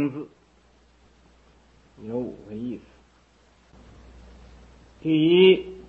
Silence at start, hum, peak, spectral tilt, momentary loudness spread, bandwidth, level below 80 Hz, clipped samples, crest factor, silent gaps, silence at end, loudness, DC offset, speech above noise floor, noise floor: 0 s; none; -4 dBFS; -8 dB/octave; 24 LU; 4.4 kHz; -56 dBFS; under 0.1%; 22 dB; none; 0.1 s; -22 LUFS; under 0.1%; 37 dB; -59 dBFS